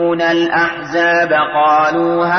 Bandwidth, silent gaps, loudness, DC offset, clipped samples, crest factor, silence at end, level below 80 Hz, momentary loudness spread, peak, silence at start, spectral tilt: 6.4 kHz; none; -13 LUFS; under 0.1%; under 0.1%; 10 dB; 0 s; -52 dBFS; 4 LU; -4 dBFS; 0 s; -5.5 dB/octave